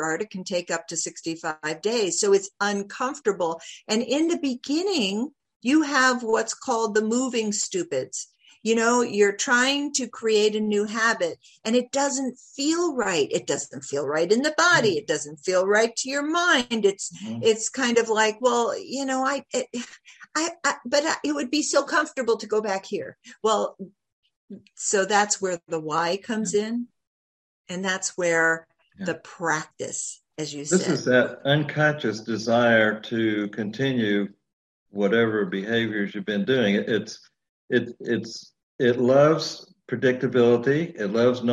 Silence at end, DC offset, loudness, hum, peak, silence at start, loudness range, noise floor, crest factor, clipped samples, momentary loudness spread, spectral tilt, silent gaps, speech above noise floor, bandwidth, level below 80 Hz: 0 s; under 0.1%; -24 LUFS; none; -6 dBFS; 0 s; 4 LU; under -90 dBFS; 18 dB; under 0.1%; 11 LU; -3.5 dB/octave; 5.56-5.60 s, 24.13-24.23 s, 24.36-24.48 s, 27.07-27.64 s, 34.53-34.86 s, 37.49-37.68 s, 38.63-38.79 s; over 66 dB; 12.5 kHz; -70 dBFS